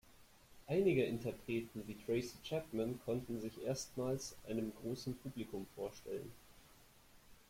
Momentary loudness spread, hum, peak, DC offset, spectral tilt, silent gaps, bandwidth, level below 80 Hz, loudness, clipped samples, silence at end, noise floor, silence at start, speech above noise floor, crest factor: 12 LU; none; -24 dBFS; under 0.1%; -6 dB/octave; none; 16.5 kHz; -66 dBFS; -42 LUFS; under 0.1%; 0.1 s; -65 dBFS; 0.05 s; 24 dB; 18 dB